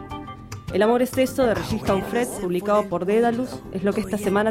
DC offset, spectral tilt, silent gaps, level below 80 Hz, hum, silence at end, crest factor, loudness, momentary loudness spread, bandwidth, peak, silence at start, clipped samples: under 0.1%; -5.5 dB/octave; none; -46 dBFS; none; 0 s; 14 dB; -22 LUFS; 10 LU; 16.5 kHz; -8 dBFS; 0 s; under 0.1%